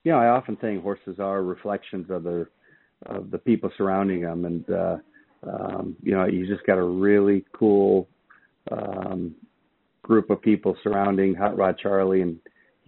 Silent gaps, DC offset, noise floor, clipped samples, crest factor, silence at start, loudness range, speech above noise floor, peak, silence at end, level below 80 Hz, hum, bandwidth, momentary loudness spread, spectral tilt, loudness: none; under 0.1%; -69 dBFS; under 0.1%; 20 dB; 0.05 s; 5 LU; 46 dB; -4 dBFS; 0.5 s; -62 dBFS; none; 4.2 kHz; 13 LU; -7 dB/octave; -24 LUFS